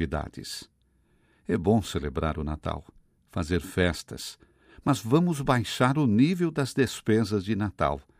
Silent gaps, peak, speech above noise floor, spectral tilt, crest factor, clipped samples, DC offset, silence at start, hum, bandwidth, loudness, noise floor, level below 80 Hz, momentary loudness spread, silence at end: none; -8 dBFS; 40 dB; -6 dB/octave; 20 dB; under 0.1%; under 0.1%; 0 s; none; 16 kHz; -27 LUFS; -66 dBFS; -46 dBFS; 14 LU; 0.2 s